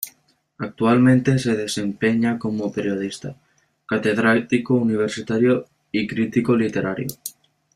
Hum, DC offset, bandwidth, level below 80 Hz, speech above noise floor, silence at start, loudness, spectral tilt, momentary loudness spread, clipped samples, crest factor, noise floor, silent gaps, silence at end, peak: none; under 0.1%; 15.5 kHz; -58 dBFS; 40 dB; 0 s; -21 LUFS; -6 dB/octave; 14 LU; under 0.1%; 16 dB; -60 dBFS; none; 0.45 s; -4 dBFS